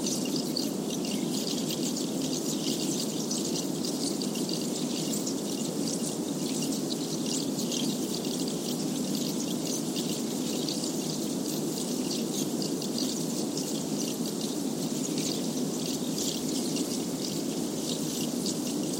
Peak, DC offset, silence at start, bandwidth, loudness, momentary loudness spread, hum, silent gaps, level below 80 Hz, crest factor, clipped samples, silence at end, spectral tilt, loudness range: -16 dBFS; under 0.1%; 0 s; 16.5 kHz; -30 LUFS; 2 LU; none; none; -68 dBFS; 16 dB; under 0.1%; 0 s; -3.5 dB/octave; 1 LU